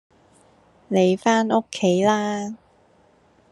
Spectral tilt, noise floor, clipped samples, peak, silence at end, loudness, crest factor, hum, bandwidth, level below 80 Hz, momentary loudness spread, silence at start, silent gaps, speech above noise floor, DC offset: -5.5 dB/octave; -57 dBFS; under 0.1%; -4 dBFS; 0.95 s; -21 LUFS; 18 dB; none; 11.5 kHz; -68 dBFS; 11 LU; 0.9 s; none; 38 dB; under 0.1%